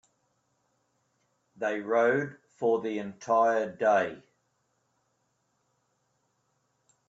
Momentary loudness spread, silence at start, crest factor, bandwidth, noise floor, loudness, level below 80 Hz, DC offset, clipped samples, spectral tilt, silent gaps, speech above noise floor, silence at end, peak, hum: 10 LU; 1.6 s; 18 dB; 7.8 kHz; -75 dBFS; -28 LUFS; -78 dBFS; under 0.1%; under 0.1%; -6 dB/octave; none; 48 dB; 2.9 s; -14 dBFS; none